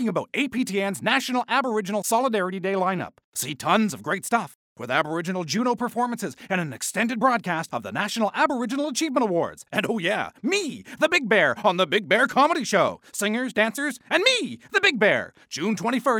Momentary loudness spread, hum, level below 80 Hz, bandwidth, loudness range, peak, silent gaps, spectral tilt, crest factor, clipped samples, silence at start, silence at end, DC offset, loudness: 8 LU; none; -70 dBFS; 19 kHz; 4 LU; -6 dBFS; 3.24-3.32 s, 4.55-4.76 s; -3.5 dB/octave; 18 dB; under 0.1%; 0 s; 0 s; under 0.1%; -23 LUFS